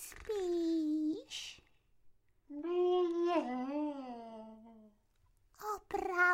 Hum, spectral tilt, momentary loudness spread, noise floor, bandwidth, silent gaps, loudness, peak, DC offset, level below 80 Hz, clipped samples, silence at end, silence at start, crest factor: none; -3.5 dB/octave; 17 LU; -72 dBFS; 16 kHz; none; -36 LUFS; -20 dBFS; under 0.1%; -68 dBFS; under 0.1%; 0 s; 0 s; 18 dB